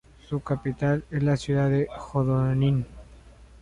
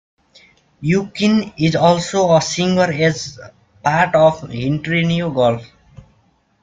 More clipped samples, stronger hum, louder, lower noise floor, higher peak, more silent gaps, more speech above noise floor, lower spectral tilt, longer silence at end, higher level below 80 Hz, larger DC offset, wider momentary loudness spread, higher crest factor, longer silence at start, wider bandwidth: neither; neither; second, -26 LUFS vs -16 LUFS; second, -49 dBFS vs -58 dBFS; second, -12 dBFS vs -2 dBFS; neither; second, 25 dB vs 42 dB; first, -8 dB/octave vs -5.5 dB/octave; second, 0.15 s vs 0.6 s; about the same, -48 dBFS vs -50 dBFS; neither; about the same, 7 LU vs 9 LU; about the same, 14 dB vs 16 dB; second, 0.3 s vs 0.8 s; about the same, 9.8 kHz vs 9.2 kHz